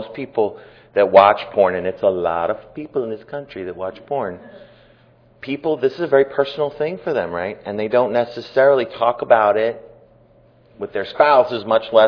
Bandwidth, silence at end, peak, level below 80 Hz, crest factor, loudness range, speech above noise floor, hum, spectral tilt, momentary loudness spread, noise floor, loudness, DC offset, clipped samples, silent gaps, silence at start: 5.4 kHz; 0 s; 0 dBFS; -60 dBFS; 18 dB; 8 LU; 34 dB; none; -7.5 dB/octave; 15 LU; -52 dBFS; -18 LUFS; under 0.1%; under 0.1%; none; 0 s